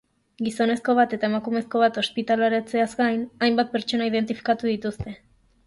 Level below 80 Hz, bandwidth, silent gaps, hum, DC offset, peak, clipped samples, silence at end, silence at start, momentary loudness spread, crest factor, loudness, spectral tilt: -56 dBFS; 11.5 kHz; none; none; under 0.1%; -8 dBFS; under 0.1%; 0.5 s; 0.4 s; 8 LU; 14 dB; -23 LUFS; -5 dB/octave